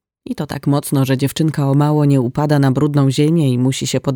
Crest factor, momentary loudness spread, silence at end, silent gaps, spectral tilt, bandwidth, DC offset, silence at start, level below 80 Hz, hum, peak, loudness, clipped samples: 12 dB; 5 LU; 0 s; none; -6.5 dB/octave; 17.5 kHz; under 0.1%; 0.3 s; -50 dBFS; none; -2 dBFS; -15 LUFS; under 0.1%